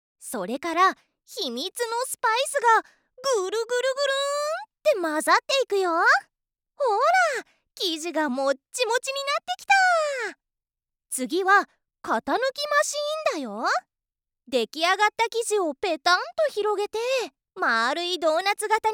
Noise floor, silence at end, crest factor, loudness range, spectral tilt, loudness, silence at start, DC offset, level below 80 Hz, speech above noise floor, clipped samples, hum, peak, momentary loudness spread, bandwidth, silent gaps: -88 dBFS; 0 s; 18 dB; 2 LU; -1 dB/octave; -24 LUFS; 0.2 s; under 0.1%; -74 dBFS; 65 dB; under 0.1%; none; -6 dBFS; 9 LU; 19 kHz; none